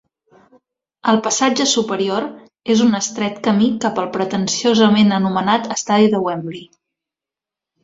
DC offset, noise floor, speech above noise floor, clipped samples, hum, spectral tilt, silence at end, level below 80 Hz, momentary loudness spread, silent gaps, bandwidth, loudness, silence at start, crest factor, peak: under 0.1%; -88 dBFS; 71 dB; under 0.1%; none; -4 dB/octave; 1.2 s; -60 dBFS; 10 LU; none; 7.8 kHz; -17 LUFS; 1.05 s; 16 dB; -2 dBFS